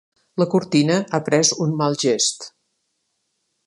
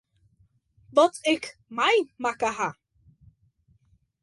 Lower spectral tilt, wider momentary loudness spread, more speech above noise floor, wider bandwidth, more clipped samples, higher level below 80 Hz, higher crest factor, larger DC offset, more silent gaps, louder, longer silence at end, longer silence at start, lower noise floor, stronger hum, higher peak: about the same, -4 dB/octave vs -3 dB/octave; about the same, 11 LU vs 9 LU; first, 53 dB vs 41 dB; about the same, 11.5 kHz vs 11.5 kHz; neither; about the same, -66 dBFS vs -66 dBFS; about the same, 18 dB vs 22 dB; neither; neither; first, -19 LUFS vs -25 LUFS; second, 1.2 s vs 1.5 s; second, 0.35 s vs 0.95 s; first, -73 dBFS vs -65 dBFS; neither; first, -2 dBFS vs -6 dBFS